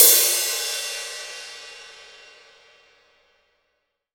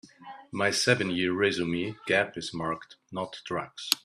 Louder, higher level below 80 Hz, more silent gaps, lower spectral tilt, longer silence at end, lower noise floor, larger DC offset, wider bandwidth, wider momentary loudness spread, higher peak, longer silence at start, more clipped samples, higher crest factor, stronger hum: first, -19 LUFS vs -28 LUFS; second, -72 dBFS vs -66 dBFS; neither; second, 3.5 dB/octave vs -3.5 dB/octave; first, 2.25 s vs 0.05 s; first, -75 dBFS vs -48 dBFS; neither; first, over 20 kHz vs 14 kHz; first, 26 LU vs 14 LU; about the same, 0 dBFS vs -2 dBFS; about the same, 0 s vs 0.05 s; neither; about the same, 24 dB vs 28 dB; neither